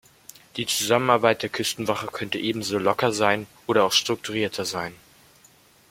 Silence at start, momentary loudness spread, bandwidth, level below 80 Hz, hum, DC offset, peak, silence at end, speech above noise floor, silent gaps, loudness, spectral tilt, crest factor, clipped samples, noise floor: 0.55 s; 9 LU; 16.5 kHz; -64 dBFS; none; under 0.1%; -2 dBFS; 0.95 s; 32 dB; none; -23 LUFS; -3 dB/octave; 22 dB; under 0.1%; -56 dBFS